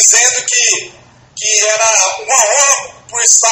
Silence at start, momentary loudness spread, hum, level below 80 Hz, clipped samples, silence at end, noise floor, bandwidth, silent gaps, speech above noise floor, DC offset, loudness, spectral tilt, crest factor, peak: 0 s; 8 LU; none; -60 dBFS; 0.4%; 0 s; -40 dBFS; over 20 kHz; none; 30 dB; under 0.1%; -9 LUFS; 2.5 dB/octave; 12 dB; 0 dBFS